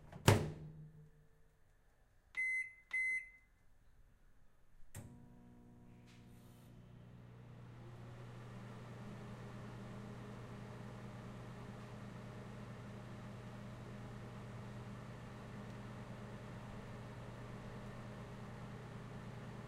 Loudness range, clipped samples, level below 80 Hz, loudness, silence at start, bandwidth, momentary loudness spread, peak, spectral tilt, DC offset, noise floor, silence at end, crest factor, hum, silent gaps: 16 LU; under 0.1%; -62 dBFS; -46 LUFS; 0 s; 15.5 kHz; 22 LU; -10 dBFS; -5 dB/octave; under 0.1%; -70 dBFS; 0 s; 38 dB; none; none